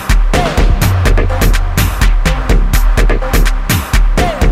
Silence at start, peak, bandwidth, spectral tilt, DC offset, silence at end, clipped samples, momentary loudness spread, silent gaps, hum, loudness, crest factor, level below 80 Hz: 0 s; 0 dBFS; 15.5 kHz; -5 dB/octave; under 0.1%; 0 s; under 0.1%; 2 LU; none; none; -13 LUFS; 10 dB; -10 dBFS